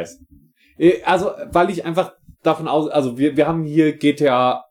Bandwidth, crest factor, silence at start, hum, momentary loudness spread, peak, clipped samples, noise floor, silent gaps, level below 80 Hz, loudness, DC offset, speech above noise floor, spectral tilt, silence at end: 14 kHz; 16 dB; 0 s; none; 6 LU; -2 dBFS; under 0.1%; -52 dBFS; none; -52 dBFS; -18 LUFS; under 0.1%; 34 dB; -6.5 dB/octave; 0.1 s